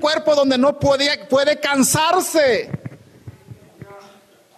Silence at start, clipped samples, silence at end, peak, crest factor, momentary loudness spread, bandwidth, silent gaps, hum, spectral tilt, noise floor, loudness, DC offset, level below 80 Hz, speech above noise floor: 0 s; under 0.1%; 0.6 s; -6 dBFS; 12 dB; 9 LU; 13.5 kHz; none; none; -3.5 dB/octave; -50 dBFS; -16 LUFS; under 0.1%; -56 dBFS; 33 dB